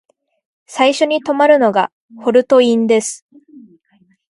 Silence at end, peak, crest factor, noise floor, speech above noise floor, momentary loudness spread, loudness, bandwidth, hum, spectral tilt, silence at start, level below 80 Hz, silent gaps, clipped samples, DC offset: 0.7 s; 0 dBFS; 16 dB; -56 dBFS; 43 dB; 13 LU; -14 LUFS; 11.5 kHz; none; -3.5 dB/octave; 0.7 s; -64 dBFS; 1.92-2.09 s, 3.22-3.29 s; under 0.1%; under 0.1%